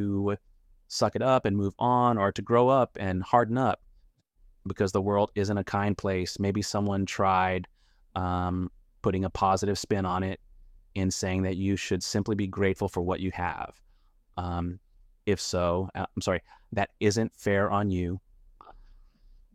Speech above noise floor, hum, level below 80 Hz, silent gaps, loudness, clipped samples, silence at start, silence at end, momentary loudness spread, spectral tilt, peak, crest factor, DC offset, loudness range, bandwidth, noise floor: 34 dB; none; -52 dBFS; none; -28 LUFS; under 0.1%; 0 s; 0.75 s; 12 LU; -6 dB/octave; -8 dBFS; 20 dB; under 0.1%; 6 LU; 14.5 kHz; -62 dBFS